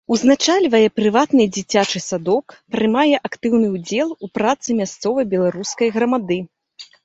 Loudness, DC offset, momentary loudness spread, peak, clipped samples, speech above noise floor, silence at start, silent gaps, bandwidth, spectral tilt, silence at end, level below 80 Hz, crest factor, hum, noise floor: -18 LUFS; under 0.1%; 7 LU; -2 dBFS; under 0.1%; 26 dB; 0.1 s; none; 8 kHz; -4.5 dB/octave; 0.2 s; -58 dBFS; 16 dB; none; -44 dBFS